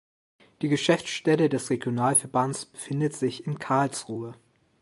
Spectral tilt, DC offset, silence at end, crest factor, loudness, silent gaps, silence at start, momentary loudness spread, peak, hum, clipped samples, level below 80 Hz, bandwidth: -4.5 dB/octave; under 0.1%; 0.45 s; 20 dB; -26 LUFS; none; 0.6 s; 11 LU; -6 dBFS; none; under 0.1%; -68 dBFS; 12 kHz